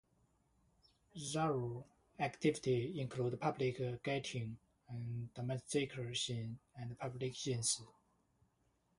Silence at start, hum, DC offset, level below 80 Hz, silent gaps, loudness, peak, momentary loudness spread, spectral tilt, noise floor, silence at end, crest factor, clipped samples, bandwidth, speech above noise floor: 1.15 s; none; under 0.1%; -72 dBFS; none; -41 LUFS; -22 dBFS; 12 LU; -4.5 dB/octave; -79 dBFS; 1.1 s; 20 dB; under 0.1%; 11.5 kHz; 39 dB